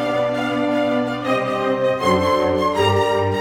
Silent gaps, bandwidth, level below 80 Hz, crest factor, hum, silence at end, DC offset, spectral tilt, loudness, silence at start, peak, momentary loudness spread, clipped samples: none; 19 kHz; -50 dBFS; 14 dB; none; 0 s; under 0.1%; -6 dB/octave; -19 LUFS; 0 s; -6 dBFS; 4 LU; under 0.1%